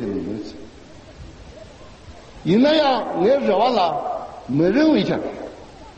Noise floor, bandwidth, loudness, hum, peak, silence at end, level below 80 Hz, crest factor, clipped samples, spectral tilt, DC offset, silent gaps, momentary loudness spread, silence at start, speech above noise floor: -42 dBFS; 8.4 kHz; -19 LUFS; none; -6 dBFS; 0.05 s; -48 dBFS; 16 dB; under 0.1%; -7 dB/octave; under 0.1%; none; 20 LU; 0 s; 25 dB